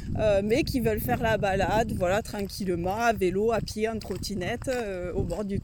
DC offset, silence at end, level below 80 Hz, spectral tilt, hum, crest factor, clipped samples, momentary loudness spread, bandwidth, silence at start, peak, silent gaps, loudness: under 0.1%; 0 s; -40 dBFS; -5.5 dB/octave; none; 16 dB; under 0.1%; 6 LU; 18 kHz; 0 s; -12 dBFS; none; -27 LUFS